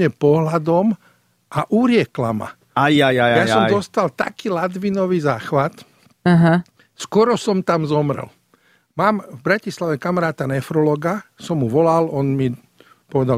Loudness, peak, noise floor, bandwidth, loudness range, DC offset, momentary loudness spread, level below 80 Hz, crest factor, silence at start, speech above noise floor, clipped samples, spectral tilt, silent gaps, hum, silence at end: -18 LUFS; -2 dBFS; -58 dBFS; 14.5 kHz; 3 LU; under 0.1%; 10 LU; -56 dBFS; 16 dB; 0 s; 40 dB; under 0.1%; -6.5 dB/octave; none; none; 0 s